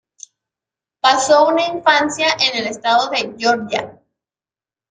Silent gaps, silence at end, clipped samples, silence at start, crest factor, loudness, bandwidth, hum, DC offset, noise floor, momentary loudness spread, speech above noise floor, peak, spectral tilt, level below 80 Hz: none; 1 s; under 0.1%; 1.05 s; 18 dB; -16 LUFS; 9.6 kHz; none; under 0.1%; under -90 dBFS; 8 LU; over 74 dB; 0 dBFS; -2 dB/octave; -62 dBFS